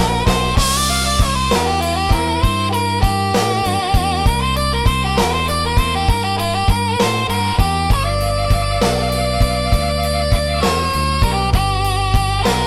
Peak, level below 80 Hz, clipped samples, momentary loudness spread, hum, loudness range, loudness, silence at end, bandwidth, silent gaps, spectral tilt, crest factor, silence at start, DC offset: -2 dBFS; -22 dBFS; under 0.1%; 2 LU; none; 1 LU; -17 LUFS; 0 s; 16 kHz; none; -4.5 dB/octave; 12 dB; 0 s; under 0.1%